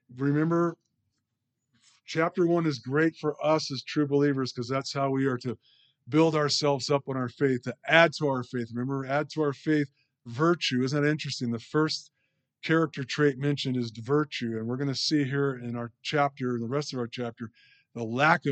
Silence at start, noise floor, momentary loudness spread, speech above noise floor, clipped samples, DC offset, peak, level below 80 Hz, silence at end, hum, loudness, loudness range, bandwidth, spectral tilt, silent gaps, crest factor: 0.1 s; -82 dBFS; 10 LU; 55 dB; under 0.1%; under 0.1%; -4 dBFS; -76 dBFS; 0 s; none; -28 LUFS; 3 LU; 8.8 kHz; -5.5 dB/octave; none; 22 dB